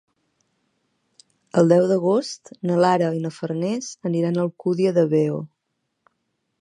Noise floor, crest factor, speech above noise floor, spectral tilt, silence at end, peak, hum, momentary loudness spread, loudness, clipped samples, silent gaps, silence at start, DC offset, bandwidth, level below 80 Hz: -76 dBFS; 20 dB; 56 dB; -7 dB/octave; 1.15 s; -2 dBFS; none; 10 LU; -21 LUFS; under 0.1%; none; 1.55 s; under 0.1%; 10.5 kHz; -72 dBFS